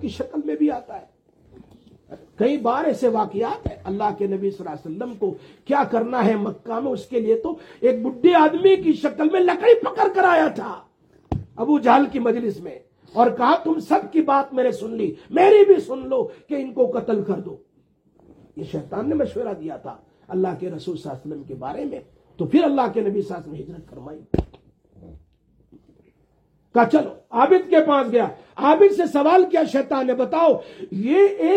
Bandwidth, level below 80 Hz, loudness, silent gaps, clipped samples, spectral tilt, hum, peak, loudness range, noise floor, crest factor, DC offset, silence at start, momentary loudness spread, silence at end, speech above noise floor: 9 kHz; -50 dBFS; -20 LUFS; none; under 0.1%; -7 dB/octave; none; -2 dBFS; 10 LU; -62 dBFS; 18 dB; under 0.1%; 0 s; 17 LU; 0 s; 42 dB